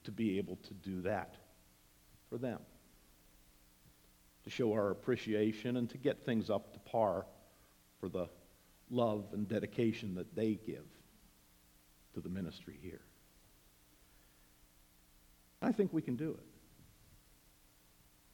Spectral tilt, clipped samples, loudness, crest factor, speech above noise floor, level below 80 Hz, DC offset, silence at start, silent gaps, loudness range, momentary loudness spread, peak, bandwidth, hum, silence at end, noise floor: -7 dB/octave; under 0.1%; -39 LUFS; 20 dB; 29 dB; -70 dBFS; under 0.1%; 0.05 s; none; 14 LU; 16 LU; -20 dBFS; 19 kHz; none; 1.85 s; -67 dBFS